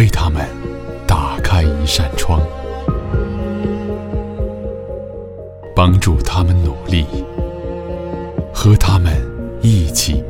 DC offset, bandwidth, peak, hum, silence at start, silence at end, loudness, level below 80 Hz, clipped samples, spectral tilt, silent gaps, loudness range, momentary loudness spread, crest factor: under 0.1%; 16.5 kHz; 0 dBFS; none; 0 s; 0 s; -17 LUFS; -24 dBFS; under 0.1%; -5.5 dB/octave; none; 4 LU; 13 LU; 14 dB